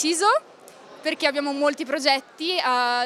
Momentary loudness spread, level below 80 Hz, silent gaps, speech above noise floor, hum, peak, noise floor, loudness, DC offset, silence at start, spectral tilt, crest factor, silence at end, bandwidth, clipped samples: 5 LU; -82 dBFS; none; 23 dB; none; -4 dBFS; -46 dBFS; -23 LUFS; under 0.1%; 0 s; -0.5 dB/octave; 20 dB; 0 s; 15 kHz; under 0.1%